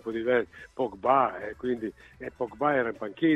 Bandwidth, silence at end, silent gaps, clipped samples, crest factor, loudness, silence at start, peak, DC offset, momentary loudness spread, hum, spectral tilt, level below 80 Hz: 7.8 kHz; 0 s; none; under 0.1%; 20 dB; -28 LUFS; 0.05 s; -8 dBFS; under 0.1%; 14 LU; none; -7.5 dB/octave; -60 dBFS